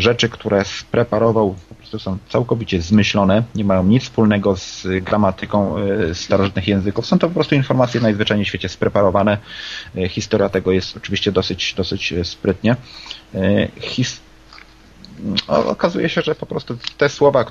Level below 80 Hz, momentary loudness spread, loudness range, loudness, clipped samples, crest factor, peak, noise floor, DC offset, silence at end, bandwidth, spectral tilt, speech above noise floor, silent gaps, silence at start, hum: -38 dBFS; 9 LU; 4 LU; -18 LUFS; under 0.1%; 16 dB; 0 dBFS; -43 dBFS; under 0.1%; 0 s; 7.6 kHz; -6 dB/octave; 26 dB; none; 0 s; none